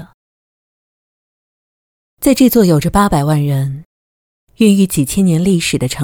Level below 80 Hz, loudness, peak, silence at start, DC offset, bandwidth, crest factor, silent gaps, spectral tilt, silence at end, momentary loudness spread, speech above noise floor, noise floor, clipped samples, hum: -36 dBFS; -13 LUFS; 0 dBFS; 0 s; under 0.1%; 19 kHz; 14 dB; 0.14-2.17 s, 3.85-4.47 s; -6 dB/octave; 0 s; 8 LU; over 78 dB; under -90 dBFS; under 0.1%; none